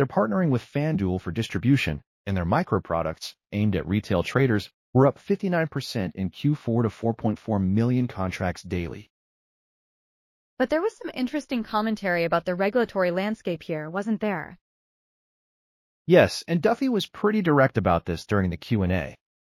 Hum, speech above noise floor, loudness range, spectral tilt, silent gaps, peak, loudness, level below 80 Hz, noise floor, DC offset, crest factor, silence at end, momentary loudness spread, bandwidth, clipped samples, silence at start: none; over 66 dB; 6 LU; -7 dB/octave; 2.07-2.24 s, 4.74-4.93 s, 9.10-10.57 s, 14.61-16.05 s; -4 dBFS; -25 LUFS; -50 dBFS; under -90 dBFS; under 0.1%; 20 dB; 0.4 s; 9 LU; 15 kHz; under 0.1%; 0 s